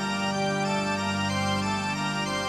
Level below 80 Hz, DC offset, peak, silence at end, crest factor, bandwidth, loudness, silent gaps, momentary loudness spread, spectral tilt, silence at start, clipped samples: -56 dBFS; under 0.1%; -12 dBFS; 0 s; 14 dB; 13.5 kHz; -27 LUFS; none; 1 LU; -4.5 dB/octave; 0 s; under 0.1%